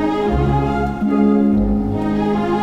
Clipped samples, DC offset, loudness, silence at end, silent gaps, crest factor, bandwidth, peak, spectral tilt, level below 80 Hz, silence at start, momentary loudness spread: under 0.1%; 0.2%; -17 LUFS; 0 s; none; 12 dB; 7.6 kHz; -4 dBFS; -9 dB/octave; -28 dBFS; 0 s; 5 LU